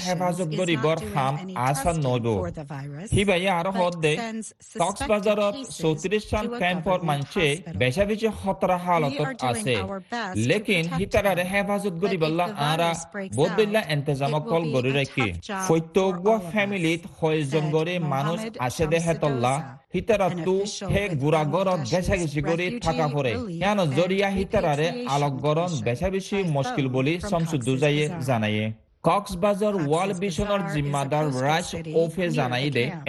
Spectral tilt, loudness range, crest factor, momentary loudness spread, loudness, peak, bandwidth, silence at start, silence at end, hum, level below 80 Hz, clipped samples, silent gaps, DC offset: -5.5 dB/octave; 1 LU; 18 dB; 5 LU; -24 LUFS; -6 dBFS; 12.5 kHz; 0 s; 0 s; none; -46 dBFS; under 0.1%; none; under 0.1%